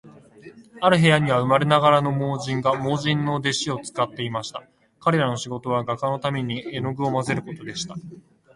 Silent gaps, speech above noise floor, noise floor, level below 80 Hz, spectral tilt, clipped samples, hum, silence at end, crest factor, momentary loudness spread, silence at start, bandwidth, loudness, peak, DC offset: none; 24 dB; -46 dBFS; -58 dBFS; -5.5 dB/octave; under 0.1%; none; 0.35 s; 20 dB; 14 LU; 0.05 s; 11.5 kHz; -22 LUFS; -2 dBFS; under 0.1%